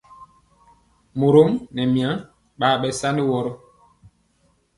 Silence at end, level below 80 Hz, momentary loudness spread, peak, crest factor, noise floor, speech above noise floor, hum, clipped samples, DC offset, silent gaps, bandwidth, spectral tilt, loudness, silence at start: 1.2 s; -56 dBFS; 15 LU; -2 dBFS; 20 dB; -63 dBFS; 44 dB; none; under 0.1%; under 0.1%; none; 11.5 kHz; -6 dB/octave; -20 LUFS; 0.2 s